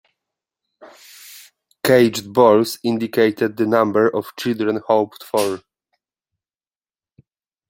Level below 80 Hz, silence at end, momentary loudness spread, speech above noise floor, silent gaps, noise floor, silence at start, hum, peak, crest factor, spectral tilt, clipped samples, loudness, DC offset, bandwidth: -64 dBFS; 2.1 s; 10 LU; over 73 dB; none; under -90 dBFS; 0.85 s; none; -2 dBFS; 18 dB; -5 dB/octave; under 0.1%; -18 LUFS; under 0.1%; 17 kHz